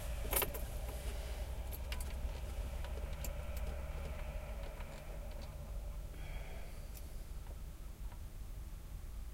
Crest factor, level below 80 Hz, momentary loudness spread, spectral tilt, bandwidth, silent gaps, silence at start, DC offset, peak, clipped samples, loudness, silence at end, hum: 22 dB; -44 dBFS; 9 LU; -4 dB/octave; 16.5 kHz; none; 0 s; under 0.1%; -20 dBFS; under 0.1%; -45 LUFS; 0 s; none